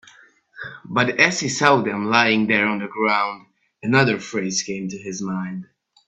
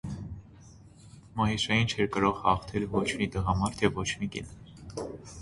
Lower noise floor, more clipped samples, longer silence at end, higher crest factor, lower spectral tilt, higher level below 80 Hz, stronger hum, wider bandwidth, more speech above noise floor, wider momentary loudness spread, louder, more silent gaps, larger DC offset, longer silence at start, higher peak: about the same, -52 dBFS vs -52 dBFS; neither; first, 0.45 s vs 0 s; about the same, 22 dB vs 20 dB; about the same, -4 dB/octave vs -5 dB/octave; second, -62 dBFS vs -46 dBFS; neither; second, 8.4 kHz vs 11.5 kHz; first, 31 dB vs 24 dB; about the same, 15 LU vs 16 LU; first, -20 LUFS vs -29 LUFS; neither; neither; first, 0.55 s vs 0.05 s; first, 0 dBFS vs -10 dBFS